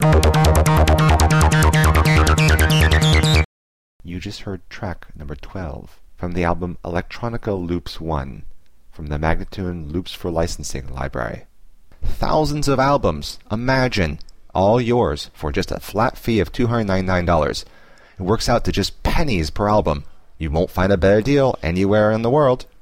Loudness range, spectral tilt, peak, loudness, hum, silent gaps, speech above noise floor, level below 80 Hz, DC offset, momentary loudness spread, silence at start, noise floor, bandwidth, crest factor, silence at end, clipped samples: 11 LU; -5.5 dB/octave; -2 dBFS; -18 LUFS; none; 3.45-4.00 s; 25 dB; -26 dBFS; 0.7%; 16 LU; 0 s; -44 dBFS; 15.5 kHz; 16 dB; 0.2 s; under 0.1%